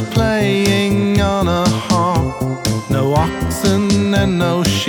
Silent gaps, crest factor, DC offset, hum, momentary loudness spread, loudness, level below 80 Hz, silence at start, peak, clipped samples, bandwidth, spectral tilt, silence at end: none; 14 dB; under 0.1%; none; 4 LU; -15 LUFS; -32 dBFS; 0 s; -2 dBFS; under 0.1%; over 20 kHz; -5.5 dB/octave; 0 s